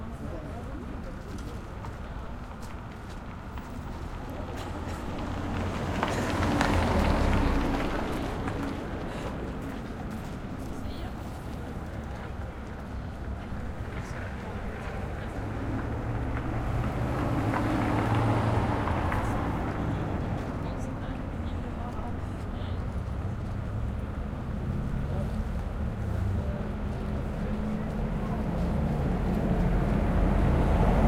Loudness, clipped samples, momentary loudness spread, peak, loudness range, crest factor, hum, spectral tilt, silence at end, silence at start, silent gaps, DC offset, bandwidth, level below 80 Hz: -32 LUFS; under 0.1%; 13 LU; -6 dBFS; 10 LU; 22 dB; none; -7 dB/octave; 0 s; 0 s; none; under 0.1%; 16 kHz; -36 dBFS